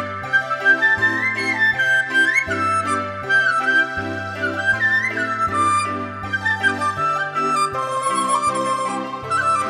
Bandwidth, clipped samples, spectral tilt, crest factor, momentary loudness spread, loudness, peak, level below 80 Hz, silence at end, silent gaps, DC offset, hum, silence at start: 14 kHz; under 0.1%; -3.5 dB/octave; 14 dB; 8 LU; -18 LUFS; -4 dBFS; -54 dBFS; 0 s; none; under 0.1%; none; 0 s